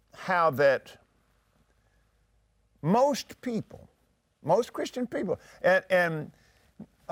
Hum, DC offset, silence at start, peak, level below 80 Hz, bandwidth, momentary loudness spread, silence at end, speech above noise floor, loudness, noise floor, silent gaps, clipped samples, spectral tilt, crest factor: none; under 0.1%; 0.2 s; -12 dBFS; -68 dBFS; 16.5 kHz; 14 LU; 0.3 s; 42 dB; -27 LUFS; -68 dBFS; none; under 0.1%; -5.5 dB/octave; 18 dB